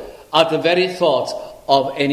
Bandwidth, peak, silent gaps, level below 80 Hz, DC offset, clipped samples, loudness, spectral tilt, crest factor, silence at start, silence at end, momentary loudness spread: 15 kHz; 0 dBFS; none; -56 dBFS; under 0.1%; under 0.1%; -17 LUFS; -4.5 dB/octave; 18 dB; 0 s; 0 s; 7 LU